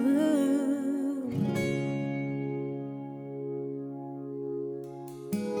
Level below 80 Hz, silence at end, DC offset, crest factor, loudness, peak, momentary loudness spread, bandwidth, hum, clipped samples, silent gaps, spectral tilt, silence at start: -68 dBFS; 0 s; under 0.1%; 16 dB; -32 LUFS; -16 dBFS; 13 LU; 17.5 kHz; none; under 0.1%; none; -7 dB/octave; 0 s